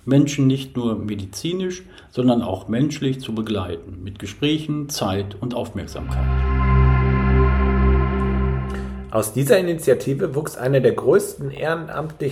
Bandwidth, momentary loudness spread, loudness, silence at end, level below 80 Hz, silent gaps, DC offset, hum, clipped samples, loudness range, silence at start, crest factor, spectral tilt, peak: 15.5 kHz; 11 LU; -21 LUFS; 0 s; -26 dBFS; none; under 0.1%; none; under 0.1%; 5 LU; 0.05 s; 18 dB; -6.5 dB/octave; -2 dBFS